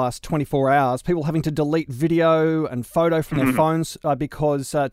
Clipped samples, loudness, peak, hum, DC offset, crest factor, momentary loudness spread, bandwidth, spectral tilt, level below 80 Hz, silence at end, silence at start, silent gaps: under 0.1%; -21 LUFS; -6 dBFS; none; under 0.1%; 14 dB; 6 LU; 16 kHz; -6.5 dB/octave; -46 dBFS; 0.05 s; 0 s; none